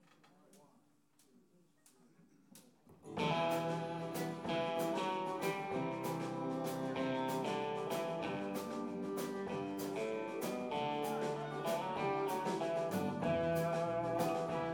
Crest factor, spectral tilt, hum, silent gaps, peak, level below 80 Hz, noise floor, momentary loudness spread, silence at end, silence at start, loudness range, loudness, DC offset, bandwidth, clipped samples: 16 dB; -5.5 dB/octave; none; none; -22 dBFS; -74 dBFS; -72 dBFS; 5 LU; 0 s; 0.55 s; 4 LU; -39 LUFS; under 0.1%; over 20 kHz; under 0.1%